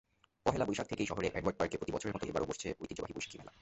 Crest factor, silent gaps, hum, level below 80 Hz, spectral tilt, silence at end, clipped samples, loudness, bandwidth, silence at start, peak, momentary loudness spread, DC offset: 24 dB; none; none; -58 dBFS; -5 dB/octave; 0.1 s; under 0.1%; -38 LUFS; 8.2 kHz; 0.45 s; -14 dBFS; 8 LU; under 0.1%